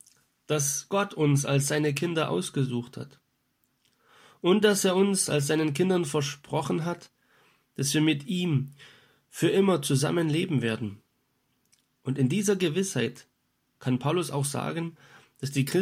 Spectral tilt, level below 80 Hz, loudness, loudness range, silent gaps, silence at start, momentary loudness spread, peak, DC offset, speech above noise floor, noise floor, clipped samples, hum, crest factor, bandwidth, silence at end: -5 dB/octave; -70 dBFS; -27 LUFS; 4 LU; none; 0.5 s; 12 LU; -8 dBFS; under 0.1%; 48 dB; -74 dBFS; under 0.1%; none; 20 dB; 16 kHz; 0 s